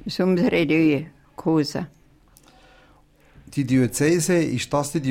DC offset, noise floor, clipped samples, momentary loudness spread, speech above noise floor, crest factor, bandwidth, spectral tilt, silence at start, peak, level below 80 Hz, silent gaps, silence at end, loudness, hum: under 0.1%; -55 dBFS; under 0.1%; 12 LU; 34 dB; 14 dB; 16.5 kHz; -5.5 dB/octave; 0 s; -8 dBFS; -52 dBFS; none; 0 s; -21 LUFS; none